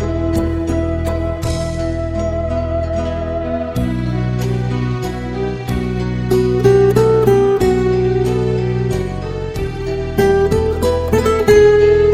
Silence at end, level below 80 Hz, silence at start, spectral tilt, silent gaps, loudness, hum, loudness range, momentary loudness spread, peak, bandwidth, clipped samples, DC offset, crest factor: 0 s; -26 dBFS; 0 s; -7 dB/octave; none; -16 LUFS; none; 6 LU; 10 LU; 0 dBFS; 15.5 kHz; under 0.1%; under 0.1%; 14 dB